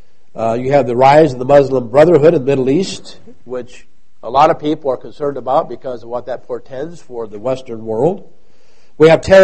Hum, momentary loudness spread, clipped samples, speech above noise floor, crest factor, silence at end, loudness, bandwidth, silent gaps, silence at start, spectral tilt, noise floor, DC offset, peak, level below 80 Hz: none; 19 LU; 0.2%; 41 dB; 14 dB; 0 s; -13 LUFS; 8.8 kHz; none; 0.35 s; -6.5 dB/octave; -54 dBFS; 3%; 0 dBFS; -44 dBFS